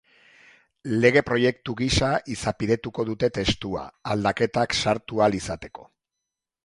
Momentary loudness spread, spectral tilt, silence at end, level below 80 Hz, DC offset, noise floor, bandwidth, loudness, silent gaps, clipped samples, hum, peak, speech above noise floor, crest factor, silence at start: 12 LU; -5 dB/octave; 0.8 s; -44 dBFS; under 0.1%; -85 dBFS; 11.5 kHz; -24 LUFS; none; under 0.1%; none; -2 dBFS; 61 dB; 22 dB; 0.85 s